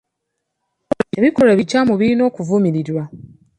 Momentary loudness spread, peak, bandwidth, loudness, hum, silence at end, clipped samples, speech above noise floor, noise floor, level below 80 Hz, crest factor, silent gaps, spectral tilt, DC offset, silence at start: 12 LU; -2 dBFS; 11 kHz; -16 LUFS; none; 0.45 s; under 0.1%; 61 dB; -76 dBFS; -54 dBFS; 16 dB; none; -7 dB/octave; under 0.1%; 1.15 s